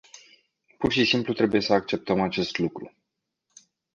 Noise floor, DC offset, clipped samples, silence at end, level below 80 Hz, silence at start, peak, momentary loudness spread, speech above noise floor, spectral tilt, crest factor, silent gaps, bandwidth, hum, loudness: -81 dBFS; under 0.1%; under 0.1%; 1.05 s; -56 dBFS; 0.15 s; -6 dBFS; 9 LU; 56 dB; -5.5 dB/octave; 20 dB; none; 7.6 kHz; none; -24 LUFS